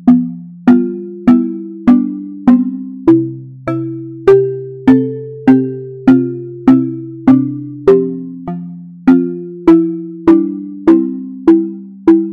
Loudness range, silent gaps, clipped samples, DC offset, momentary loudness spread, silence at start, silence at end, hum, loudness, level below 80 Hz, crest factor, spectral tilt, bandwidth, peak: 1 LU; none; 0.2%; under 0.1%; 10 LU; 0 s; 0 s; none; -13 LUFS; -46 dBFS; 12 dB; -10 dB/octave; 4.7 kHz; 0 dBFS